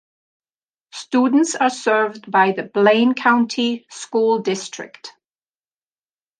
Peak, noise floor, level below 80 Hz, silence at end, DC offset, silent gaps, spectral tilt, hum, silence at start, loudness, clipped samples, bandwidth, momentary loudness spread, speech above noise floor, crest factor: -2 dBFS; under -90 dBFS; -74 dBFS; 1.3 s; under 0.1%; none; -4 dB/octave; none; 0.95 s; -18 LUFS; under 0.1%; 10 kHz; 17 LU; over 72 dB; 18 dB